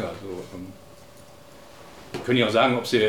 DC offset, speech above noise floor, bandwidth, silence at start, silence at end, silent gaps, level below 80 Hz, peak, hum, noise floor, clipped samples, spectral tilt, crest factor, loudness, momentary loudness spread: 0.2%; 25 dB; 18.5 kHz; 0 s; 0 s; none; -62 dBFS; -6 dBFS; none; -48 dBFS; under 0.1%; -5 dB/octave; 20 dB; -23 LUFS; 25 LU